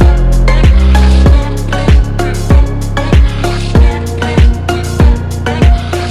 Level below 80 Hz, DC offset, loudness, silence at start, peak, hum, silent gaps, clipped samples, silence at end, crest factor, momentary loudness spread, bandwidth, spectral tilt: -10 dBFS; under 0.1%; -10 LUFS; 0 s; 0 dBFS; none; none; 4%; 0 s; 8 dB; 7 LU; 12.5 kHz; -6.5 dB/octave